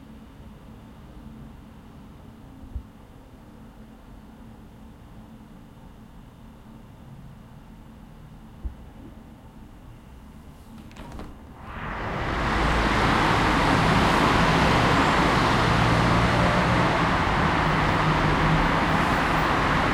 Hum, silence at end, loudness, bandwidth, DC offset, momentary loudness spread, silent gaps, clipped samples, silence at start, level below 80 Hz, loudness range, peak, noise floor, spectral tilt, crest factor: none; 0 s; -21 LUFS; 16.5 kHz; under 0.1%; 24 LU; none; under 0.1%; 0 s; -36 dBFS; 25 LU; -8 dBFS; -46 dBFS; -5.5 dB/octave; 18 dB